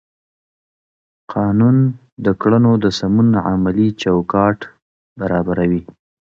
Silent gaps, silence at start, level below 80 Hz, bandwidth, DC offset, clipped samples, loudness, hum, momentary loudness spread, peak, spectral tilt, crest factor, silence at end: 2.12-2.17 s, 4.82-5.16 s; 1.3 s; -42 dBFS; 7.4 kHz; under 0.1%; under 0.1%; -16 LUFS; none; 9 LU; 0 dBFS; -8 dB/octave; 16 dB; 0.55 s